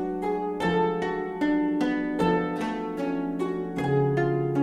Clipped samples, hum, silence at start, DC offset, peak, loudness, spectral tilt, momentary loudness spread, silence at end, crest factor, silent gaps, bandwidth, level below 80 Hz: under 0.1%; none; 0 s; under 0.1%; -12 dBFS; -27 LUFS; -7.5 dB/octave; 5 LU; 0 s; 14 dB; none; 11.5 kHz; -52 dBFS